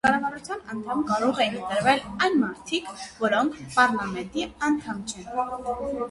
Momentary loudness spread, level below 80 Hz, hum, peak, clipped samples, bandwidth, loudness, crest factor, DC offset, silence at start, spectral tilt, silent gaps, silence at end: 10 LU; -54 dBFS; none; -6 dBFS; under 0.1%; 11.5 kHz; -26 LUFS; 20 dB; under 0.1%; 0.05 s; -4 dB/octave; none; 0 s